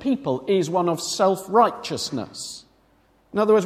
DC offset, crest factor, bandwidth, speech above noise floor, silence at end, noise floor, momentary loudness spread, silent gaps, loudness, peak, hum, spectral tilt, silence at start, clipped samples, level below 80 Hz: under 0.1%; 18 dB; 16 kHz; 38 dB; 0 s; -60 dBFS; 14 LU; none; -22 LUFS; -4 dBFS; none; -5 dB/octave; 0 s; under 0.1%; -62 dBFS